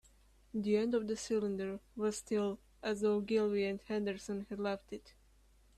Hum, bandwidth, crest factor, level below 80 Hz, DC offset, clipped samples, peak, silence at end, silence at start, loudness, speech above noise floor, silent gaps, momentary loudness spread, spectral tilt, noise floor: none; 13 kHz; 16 dB; -66 dBFS; under 0.1%; under 0.1%; -22 dBFS; 0.65 s; 0.55 s; -37 LUFS; 30 dB; none; 10 LU; -5.5 dB/octave; -66 dBFS